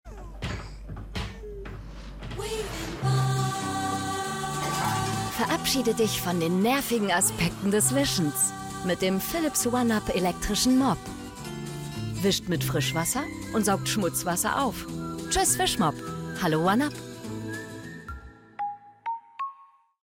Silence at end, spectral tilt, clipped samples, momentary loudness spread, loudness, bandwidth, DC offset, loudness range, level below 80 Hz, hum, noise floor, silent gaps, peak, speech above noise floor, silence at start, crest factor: 0.4 s; -4 dB/octave; under 0.1%; 15 LU; -27 LUFS; 17 kHz; under 0.1%; 6 LU; -46 dBFS; none; -55 dBFS; none; -12 dBFS; 29 dB; 0.05 s; 16 dB